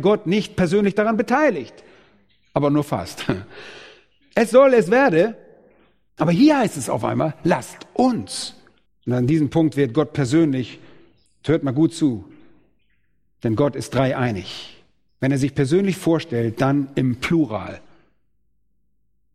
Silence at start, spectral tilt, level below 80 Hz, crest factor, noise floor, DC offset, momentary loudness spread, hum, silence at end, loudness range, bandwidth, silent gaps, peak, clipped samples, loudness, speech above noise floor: 0 s; -6.5 dB/octave; -52 dBFS; 20 dB; -71 dBFS; under 0.1%; 15 LU; none; 1.55 s; 6 LU; 14.5 kHz; none; -2 dBFS; under 0.1%; -20 LUFS; 52 dB